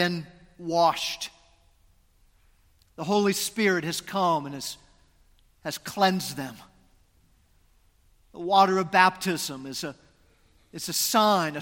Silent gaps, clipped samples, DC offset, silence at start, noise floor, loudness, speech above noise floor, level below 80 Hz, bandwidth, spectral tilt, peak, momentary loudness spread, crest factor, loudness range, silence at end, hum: none; under 0.1%; under 0.1%; 0 s; -63 dBFS; -25 LUFS; 37 dB; -62 dBFS; 17 kHz; -3.5 dB/octave; -4 dBFS; 17 LU; 24 dB; 7 LU; 0 s; none